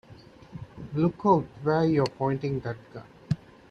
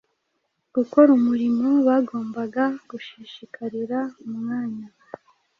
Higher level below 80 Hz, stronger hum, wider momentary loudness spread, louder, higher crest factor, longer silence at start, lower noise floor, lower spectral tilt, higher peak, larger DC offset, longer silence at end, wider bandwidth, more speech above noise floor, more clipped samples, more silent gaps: first, -56 dBFS vs -70 dBFS; neither; about the same, 21 LU vs 22 LU; second, -27 LUFS vs -22 LUFS; about the same, 20 dB vs 20 dB; second, 0.1 s vs 0.75 s; second, -50 dBFS vs -74 dBFS; about the same, -8.5 dB/octave vs -7.5 dB/octave; second, -8 dBFS vs -4 dBFS; neither; second, 0.35 s vs 0.7 s; first, 8.6 kHz vs 6.6 kHz; second, 24 dB vs 53 dB; neither; neither